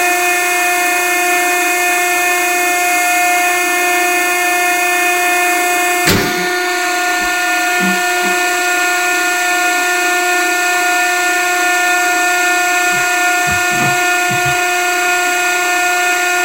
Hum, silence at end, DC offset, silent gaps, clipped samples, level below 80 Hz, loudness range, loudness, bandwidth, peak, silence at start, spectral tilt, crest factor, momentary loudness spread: none; 0 s; 0.2%; none; under 0.1%; -48 dBFS; 1 LU; -12 LUFS; 16.5 kHz; 0 dBFS; 0 s; -1.5 dB/octave; 14 dB; 1 LU